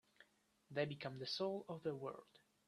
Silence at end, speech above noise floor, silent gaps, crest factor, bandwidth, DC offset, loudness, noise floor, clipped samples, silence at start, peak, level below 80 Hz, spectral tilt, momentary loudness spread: 0.3 s; 30 dB; none; 20 dB; 13 kHz; under 0.1%; -46 LUFS; -75 dBFS; under 0.1%; 0.2 s; -28 dBFS; -84 dBFS; -5.5 dB/octave; 7 LU